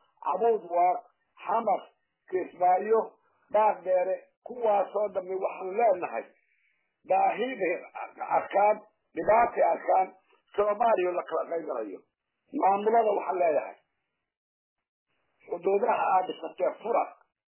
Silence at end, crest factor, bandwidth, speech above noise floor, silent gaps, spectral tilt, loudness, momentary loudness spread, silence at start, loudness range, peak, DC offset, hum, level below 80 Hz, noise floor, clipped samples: 0.45 s; 16 dB; 3.2 kHz; 55 dB; 4.37-4.42 s, 14.37-14.76 s, 14.88-15.06 s; -8.5 dB/octave; -28 LUFS; 12 LU; 0.25 s; 4 LU; -12 dBFS; under 0.1%; none; -72 dBFS; -82 dBFS; under 0.1%